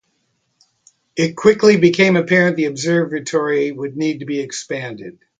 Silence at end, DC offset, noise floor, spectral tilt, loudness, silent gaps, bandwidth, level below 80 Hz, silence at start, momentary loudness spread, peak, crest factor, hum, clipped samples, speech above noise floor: 0.3 s; under 0.1%; -67 dBFS; -5.5 dB/octave; -16 LUFS; none; 9.4 kHz; -60 dBFS; 1.15 s; 14 LU; 0 dBFS; 18 dB; none; under 0.1%; 51 dB